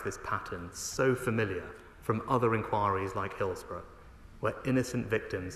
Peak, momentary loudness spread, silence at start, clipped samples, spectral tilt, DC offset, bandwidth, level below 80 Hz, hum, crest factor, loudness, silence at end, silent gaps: -14 dBFS; 12 LU; 0 s; under 0.1%; -5.5 dB/octave; under 0.1%; 13 kHz; -54 dBFS; none; 20 dB; -32 LUFS; 0 s; none